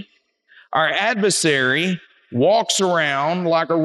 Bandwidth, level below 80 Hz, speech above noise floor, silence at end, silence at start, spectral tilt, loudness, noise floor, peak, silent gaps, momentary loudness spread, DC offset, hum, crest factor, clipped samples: 12.5 kHz; -76 dBFS; 39 dB; 0 s; 0 s; -3.5 dB/octave; -18 LUFS; -58 dBFS; -4 dBFS; none; 7 LU; under 0.1%; none; 16 dB; under 0.1%